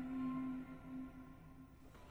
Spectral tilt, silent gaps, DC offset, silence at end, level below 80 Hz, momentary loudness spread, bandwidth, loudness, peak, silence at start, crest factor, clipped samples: -8 dB/octave; none; under 0.1%; 0 s; -64 dBFS; 18 LU; 8.4 kHz; -47 LUFS; -34 dBFS; 0 s; 14 dB; under 0.1%